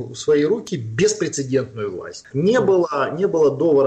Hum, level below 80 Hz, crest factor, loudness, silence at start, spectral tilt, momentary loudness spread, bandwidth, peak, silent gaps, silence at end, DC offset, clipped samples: none; -58 dBFS; 10 dB; -19 LUFS; 0 s; -5.5 dB/octave; 11 LU; 9 kHz; -8 dBFS; none; 0 s; under 0.1%; under 0.1%